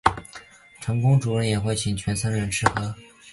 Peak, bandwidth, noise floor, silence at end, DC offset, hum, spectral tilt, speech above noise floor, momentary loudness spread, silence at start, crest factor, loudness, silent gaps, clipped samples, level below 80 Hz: 0 dBFS; 11.5 kHz; -46 dBFS; 0 s; under 0.1%; none; -5 dB/octave; 23 dB; 18 LU; 0.05 s; 24 dB; -24 LUFS; none; under 0.1%; -44 dBFS